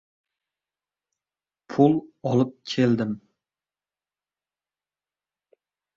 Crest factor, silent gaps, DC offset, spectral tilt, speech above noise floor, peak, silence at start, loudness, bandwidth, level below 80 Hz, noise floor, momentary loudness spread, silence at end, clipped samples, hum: 24 dB; none; under 0.1%; -7.5 dB/octave; over 68 dB; -4 dBFS; 1.7 s; -23 LUFS; 7.6 kHz; -68 dBFS; under -90 dBFS; 11 LU; 2.8 s; under 0.1%; 50 Hz at -60 dBFS